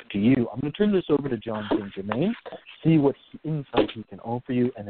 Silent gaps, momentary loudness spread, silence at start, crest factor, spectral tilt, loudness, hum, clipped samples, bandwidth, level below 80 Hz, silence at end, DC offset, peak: none; 11 LU; 0 s; 18 dB; -12 dB/octave; -25 LUFS; none; under 0.1%; 4.5 kHz; -54 dBFS; 0 s; under 0.1%; -6 dBFS